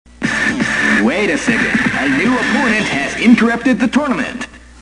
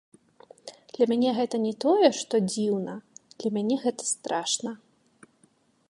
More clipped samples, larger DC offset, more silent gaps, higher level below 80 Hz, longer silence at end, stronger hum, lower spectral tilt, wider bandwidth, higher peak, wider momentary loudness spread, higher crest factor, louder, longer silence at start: neither; first, 0.2% vs under 0.1%; neither; first, -42 dBFS vs -78 dBFS; second, 0 s vs 1.15 s; neither; about the same, -4.5 dB/octave vs -4 dB/octave; about the same, 10.5 kHz vs 11.5 kHz; first, 0 dBFS vs -6 dBFS; second, 7 LU vs 21 LU; second, 14 dB vs 22 dB; first, -14 LUFS vs -26 LUFS; second, 0.2 s vs 0.65 s